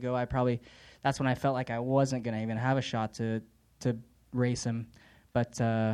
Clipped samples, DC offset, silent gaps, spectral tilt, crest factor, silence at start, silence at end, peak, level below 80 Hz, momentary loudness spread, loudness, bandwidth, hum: under 0.1%; under 0.1%; none; -6.5 dB/octave; 18 dB; 0 s; 0 s; -12 dBFS; -56 dBFS; 9 LU; -32 LUFS; 11.5 kHz; none